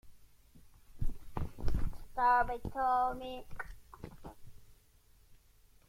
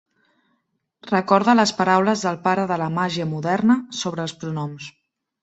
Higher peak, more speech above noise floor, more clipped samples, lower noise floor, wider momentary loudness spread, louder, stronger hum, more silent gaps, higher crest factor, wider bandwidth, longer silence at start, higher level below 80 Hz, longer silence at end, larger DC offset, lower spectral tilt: second, -18 dBFS vs -2 dBFS; second, 32 dB vs 52 dB; neither; second, -64 dBFS vs -72 dBFS; first, 22 LU vs 11 LU; second, -35 LUFS vs -20 LUFS; neither; neither; about the same, 18 dB vs 20 dB; first, 15 kHz vs 8.2 kHz; second, 0.05 s vs 1.05 s; first, -44 dBFS vs -64 dBFS; about the same, 0.55 s vs 0.5 s; neither; first, -6.5 dB/octave vs -5 dB/octave